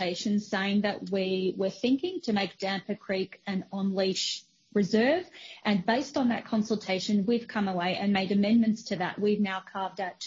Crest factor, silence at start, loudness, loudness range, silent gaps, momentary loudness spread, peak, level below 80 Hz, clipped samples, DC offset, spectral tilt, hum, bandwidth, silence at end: 16 dB; 0 s; -29 LUFS; 3 LU; none; 8 LU; -12 dBFS; -70 dBFS; under 0.1%; under 0.1%; -5.5 dB/octave; none; 7.6 kHz; 0 s